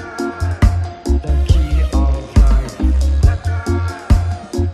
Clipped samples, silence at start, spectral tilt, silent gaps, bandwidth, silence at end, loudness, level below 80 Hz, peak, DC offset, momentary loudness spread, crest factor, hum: under 0.1%; 0 s; -7 dB/octave; none; 11.5 kHz; 0 s; -17 LUFS; -16 dBFS; 0 dBFS; under 0.1%; 6 LU; 14 dB; none